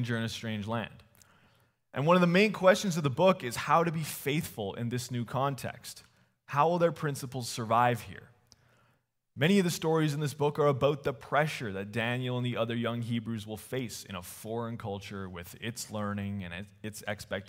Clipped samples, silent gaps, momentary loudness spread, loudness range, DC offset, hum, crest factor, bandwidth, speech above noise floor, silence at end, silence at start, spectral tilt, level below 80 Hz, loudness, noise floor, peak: under 0.1%; none; 15 LU; 10 LU; under 0.1%; none; 22 dB; 16 kHz; 43 dB; 0.05 s; 0 s; -5.5 dB/octave; -66 dBFS; -30 LUFS; -73 dBFS; -8 dBFS